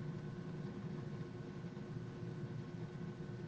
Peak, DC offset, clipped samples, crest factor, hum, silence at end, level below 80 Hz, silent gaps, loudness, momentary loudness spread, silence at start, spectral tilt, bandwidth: -34 dBFS; under 0.1%; under 0.1%; 12 dB; none; 0 s; -68 dBFS; none; -47 LUFS; 2 LU; 0 s; -8 dB/octave; 8.2 kHz